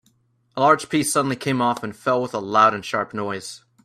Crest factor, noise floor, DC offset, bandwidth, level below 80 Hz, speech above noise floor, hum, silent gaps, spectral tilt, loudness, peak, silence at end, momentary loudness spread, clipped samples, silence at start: 20 dB; -63 dBFS; under 0.1%; 14.5 kHz; -64 dBFS; 42 dB; none; none; -4.5 dB/octave; -21 LUFS; -2 dBFS; 0.25 s; 12 LU; under 0.1%; 0.55 s